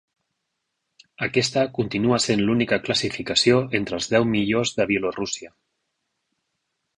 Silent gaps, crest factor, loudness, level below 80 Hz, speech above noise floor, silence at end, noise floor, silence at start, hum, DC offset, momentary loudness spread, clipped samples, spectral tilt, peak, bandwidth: none; 20 dB; -22 LUFS; -54 dBFS; 56 dB; 1.5 s; -78 dBFS; 1.2 s; none; under 0.1%; 7 LU; under 0.1%; -4 dB/octave; -4 dBFS; 11 kHz